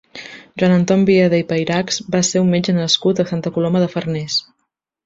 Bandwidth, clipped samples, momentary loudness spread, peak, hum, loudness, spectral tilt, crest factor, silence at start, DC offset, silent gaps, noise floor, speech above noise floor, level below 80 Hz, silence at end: 8 kHz; under 0.1%; 8 LU; -2 dBFS; none; -16 LUFS; -5 dB/octave; 16 dB; 0.15 s; under 0.1%; none; -73 dBFS; 57 dB; -56 dBFS; 0.65 s